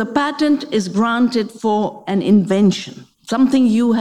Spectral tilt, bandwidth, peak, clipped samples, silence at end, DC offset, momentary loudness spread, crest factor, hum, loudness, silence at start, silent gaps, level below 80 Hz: -6 dB/octave; 11.5 kHz; -2 dBFS; under 0.1%; 0 s; 0.2%; 7 LU; 14 dB; none; -16 LUFS; 0 s; none; -60 dBFS